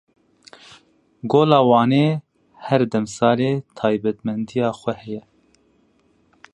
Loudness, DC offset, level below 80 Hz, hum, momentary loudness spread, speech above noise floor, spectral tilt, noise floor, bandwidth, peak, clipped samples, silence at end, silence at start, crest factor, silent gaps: -19 LUFS; under 0.1%; -62 dBFS; none; 16 LU; 42 dB; -7 dB/octave; -60 dBFS; 11 kHz; 0 dBFS; under 0.1%; 1.35 s; 1.25 s; 20 dB; none